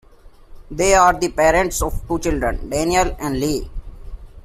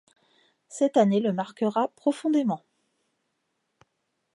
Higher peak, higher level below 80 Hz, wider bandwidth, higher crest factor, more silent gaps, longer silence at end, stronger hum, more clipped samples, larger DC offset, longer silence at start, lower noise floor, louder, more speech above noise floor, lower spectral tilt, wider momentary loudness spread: first, -2 dBFS vs -8 dBFS; first, -30 dBFS vs -80 dBFS; first, 16 kHz vs 11 kHz; about the same, 18 dB vs 20 dB; neither; second, 0.05 s vs 1.75 s; neither; neither; neither; second, 0.25 s vs 0.7 s; second, -44 dBFS vs -78 dBFS; first, -18 LUFS vs -25 LUFS; second, 26 dB vs 53 dB; second, -4 dB/octave vs -6.5 dB/octave; first, 12 LU vs 8 LU